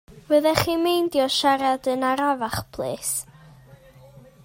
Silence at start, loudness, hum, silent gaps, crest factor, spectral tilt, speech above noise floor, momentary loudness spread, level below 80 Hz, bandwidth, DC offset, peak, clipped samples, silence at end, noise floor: 0.1 s; -22 LUFS; none; none; 22 dB; -3.5 dB/octave; 27 dB; 9 LU; -54 dBFS; 16.5 kHz; under 0.1%; 0 dBFS; under 0.1%; 0.7 s; -49 dBFS